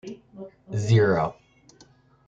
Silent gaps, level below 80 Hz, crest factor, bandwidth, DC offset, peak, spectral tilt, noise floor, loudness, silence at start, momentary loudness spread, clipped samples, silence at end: none; -58 dBFS; 18 dB; 7.8 kHz; under 0.1%; -8 dBFS; -7 dB/octave; -57 dBFS; -23 LUFS; 0.05 s; 24 LU; under 0.1%; 0.95 s